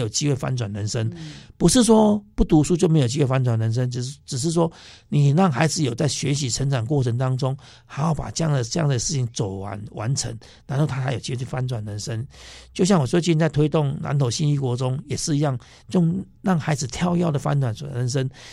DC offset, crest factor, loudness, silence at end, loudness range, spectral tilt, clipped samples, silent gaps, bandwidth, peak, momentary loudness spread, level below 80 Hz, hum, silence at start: under 0.1%; 18 dB; -22 LUFS; 0 s; 6 LU; -5.5 dB/octave; under 0.1%; none; 12.5 kHz; -2 dBFS; 11 LU; -42 dBFS; none; 0 s